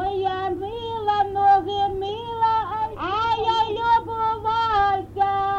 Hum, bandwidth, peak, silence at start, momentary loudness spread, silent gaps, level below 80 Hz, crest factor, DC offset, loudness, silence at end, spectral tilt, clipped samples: none; 7.8 kHz; -8 dBFS; 0 s; 8 LU; none; -46 dBFS; 14 dB; under 0.1%; -22 LUFS; 0 s; -5.5 dB/octave; under 0.1%